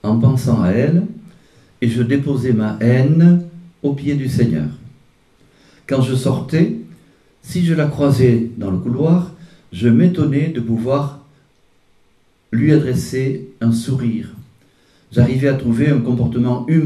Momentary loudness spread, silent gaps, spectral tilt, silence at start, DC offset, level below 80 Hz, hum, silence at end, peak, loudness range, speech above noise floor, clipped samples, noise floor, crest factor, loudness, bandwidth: 9 LU; none; -8 dB/octave; 0.05 s; under 0.1%; -46 dBFS; none; 0 s; 0 dBFS; 4 LU; 41 dB; under 0.1%; -56 dBFS; 16 dB; -16 LUFS; 13 kHz